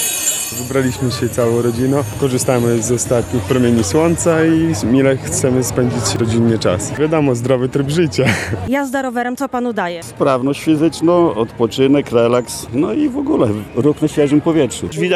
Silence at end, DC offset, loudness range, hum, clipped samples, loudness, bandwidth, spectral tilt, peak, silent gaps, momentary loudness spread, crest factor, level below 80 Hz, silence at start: 0 s; under 0.1%; 2 LU; none; under 0.1%; -15 LUFS; 13.5 kHz; -5 dB/octave; 0 dBFS; none; 5 LU; 14 dB; -42 dBFS; 0 s